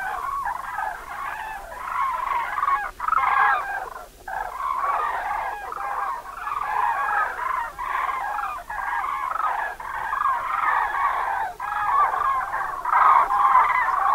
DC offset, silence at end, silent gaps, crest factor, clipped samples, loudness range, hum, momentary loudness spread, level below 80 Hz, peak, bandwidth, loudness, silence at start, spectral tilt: under 0.1%; 0 s; none; 20 dB; under 0.1%; 5 LU; none; 13 LU; -50 dBFS; -4 dBFS; 16 kHz; -23 LUFS; 0 s; -2.5 dB/octave